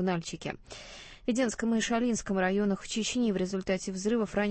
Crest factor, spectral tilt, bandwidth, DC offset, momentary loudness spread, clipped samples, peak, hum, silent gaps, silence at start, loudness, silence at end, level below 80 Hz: 16 dB; -4.5 dB/octave; 8.8 kHz; under 0.1%; 11 LU; under 0.1%; -14 dBFS; none; none; 0 s; -30 LUFS; 0 s; -54 dBFS